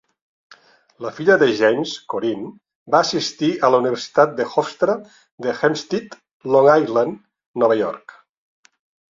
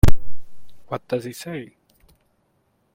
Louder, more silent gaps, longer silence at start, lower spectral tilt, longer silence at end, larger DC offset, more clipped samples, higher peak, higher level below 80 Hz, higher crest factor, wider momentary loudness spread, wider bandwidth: first, -19 LUFS vs -29 LUFS; first, 2.75-2.86 s, 5.31-5.38 s, 6.33-6.40 s, 7.46-7.54 s vs none; first, 1 s vs 0.05 s; second, -5 dB/octave vs -6.5 dB/octave; second, 1.15 s vs 1.3 s; neither; second, under 0.1% vs 0.1%; about the same, -2 dBFS vs 0 dBFS; second, -66 dBFS vs -30 dBFS; about the same, 18 dB vs 18 dB; about the same, 16 LU vs 17 LU; second, 7.6 kHz vs 16 kHz